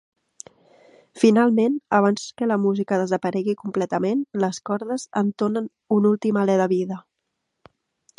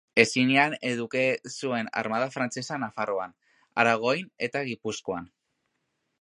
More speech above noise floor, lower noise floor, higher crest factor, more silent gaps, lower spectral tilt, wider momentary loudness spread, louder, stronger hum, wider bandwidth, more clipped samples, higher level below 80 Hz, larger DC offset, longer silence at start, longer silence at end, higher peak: first, 57 dB vs 51 dB; about the same, -78 dBFS vs -78 dBFS; second, 20 dB vs 26 dB; neither; first, -6.5 dB/octave vs -4 dB/octave; second, 8 LU vs 12 LU; first, -22 LUFS vs -27 LUFS; neither; about the same, 11 kHz vs 11.5 kHz; neither; about the same, -70 dBFS vs -70 dBFS; neither; first, 1.15 s vs 0.15 s; first, 1.2 s vs 0.95 s; about the same, -2 dBFS vs -2 dBFS